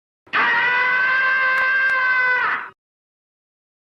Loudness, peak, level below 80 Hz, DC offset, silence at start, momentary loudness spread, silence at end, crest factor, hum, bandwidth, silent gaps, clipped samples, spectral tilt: -17 LUFS; -10 dBFS; -72 dBFS; under 0.1%; 0.35 s; 7 LU; 1.15 s; 12 dB; none; 7.6 kHz; none; under 0.1%; -2.5 dB/octave